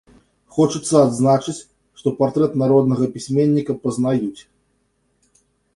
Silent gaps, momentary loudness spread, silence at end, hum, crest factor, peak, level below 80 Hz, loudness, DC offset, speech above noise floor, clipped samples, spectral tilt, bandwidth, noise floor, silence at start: none; 10 LU; 1.35 s; none; 18 dB; -2 dBFS; -56 dBFS; -18 LUFS; under 0.1%; 49 dB; under 0.1%; -7 dB/octave; 11.5 kHz; -66 dBFS; 0.55 s